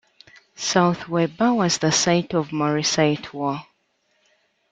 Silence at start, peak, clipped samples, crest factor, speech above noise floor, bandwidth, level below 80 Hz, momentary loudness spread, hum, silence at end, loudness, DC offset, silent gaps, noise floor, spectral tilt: 0.6 s; -4 dBFS; under 0.1%; 18 dB; 47 dB; 9.4 kHz; -60 dBFS; 9 LU; none; 1.1 s; -21 LUFS; under 0.1%; none; -68 dBFS; -4 dB/octave